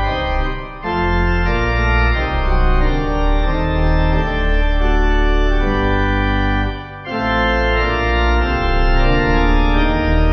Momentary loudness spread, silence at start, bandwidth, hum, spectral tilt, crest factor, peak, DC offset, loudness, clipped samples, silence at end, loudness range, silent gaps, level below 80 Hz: 4 LU; 0 s; 6.2 kHz; none; -7.5 dB/octave; 12 dB; -2 dBFS; under 0.1%; -17 LUFS; under 0.1%; 0 s; 1 LU; none; -16 dBFS